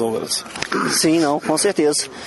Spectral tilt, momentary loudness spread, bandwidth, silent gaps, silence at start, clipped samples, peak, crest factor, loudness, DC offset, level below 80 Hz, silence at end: -3 dB/octave; 7 LU; 12 kHz; none; 0 s; under 0.1%; -2 dBFS; 16 dB; -18 LUFS; under 0.1%; -58 dBFS; 0 s